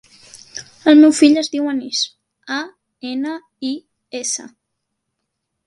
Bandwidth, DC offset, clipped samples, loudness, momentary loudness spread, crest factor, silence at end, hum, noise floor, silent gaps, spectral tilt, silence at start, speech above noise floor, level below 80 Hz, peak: 11.5 kHz; under 0.1%; under 0.1%; -17 LUFS; 23 LU; 18 dB; 1.2 s; none; -76 dBFS; none; -2 dB/octave; 0.55 s; 60 dB; -66 dBFS; 0 dBFS